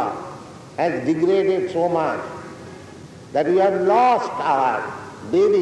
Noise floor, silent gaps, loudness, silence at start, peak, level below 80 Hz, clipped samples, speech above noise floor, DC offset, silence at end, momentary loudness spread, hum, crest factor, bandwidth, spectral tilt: -40 dBFS; none; -20 LUFS; 0 s; -8 dBFS; -62 dBFS; under 0.1%; 21 dB; under 0.1%; 0 s; 21 LU; none; 14 dB; 10.5 kHz; -6.5 dB/octave